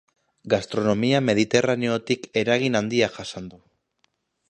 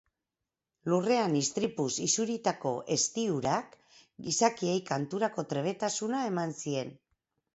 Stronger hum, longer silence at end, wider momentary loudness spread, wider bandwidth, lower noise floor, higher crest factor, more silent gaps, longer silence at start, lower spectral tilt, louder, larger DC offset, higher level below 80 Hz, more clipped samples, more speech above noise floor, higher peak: neither; first, 0.95 s vs 0.6 s; first, 12 LU vs 7 LU; first, 10.5 kHz vs 8.2 kHz; second, -70 dBFS vs -89 dBFS; about the same, 22 dB vs 20 dB; neither; second, 0.45 s vs 0.85 s; about the same, -5 dB/octave vs -4 dB/octave; first, -22 LUFS vs -31 LUFS; neither; first, -58 dBFS vs -70 dBFS; neither; second, 48 dB vs 59 dB; first, -2 dBFS vs -12 dBFS